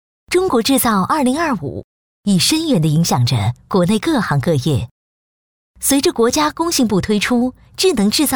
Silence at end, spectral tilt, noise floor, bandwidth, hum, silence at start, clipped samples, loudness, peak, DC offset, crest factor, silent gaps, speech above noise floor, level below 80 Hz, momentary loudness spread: 0 s; -4.5 dB/octave; under -90 dBFS; over 20 kHz; none; 0.3 s; under 0.1%; -16 LUFS; -4 dBFS; 0.2%; 12 dB; 1.84-2.23 s, 4.91-5.74 s; over 75 dB; -44 dBFS; 6 LU